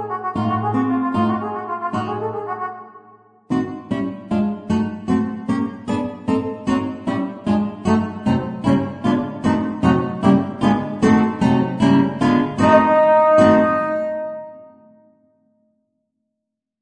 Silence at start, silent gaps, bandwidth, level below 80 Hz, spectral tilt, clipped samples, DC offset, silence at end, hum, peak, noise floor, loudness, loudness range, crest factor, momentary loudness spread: 0 s; none; 9.8 kHz; -50 dBFS; -7.5 dB/octave; under 0.1%; under 0.1%; 2.15 s; none; 0 dBFS; -80 dBFS; -19 LUFS; 9 LU; 18 dB; 11 LU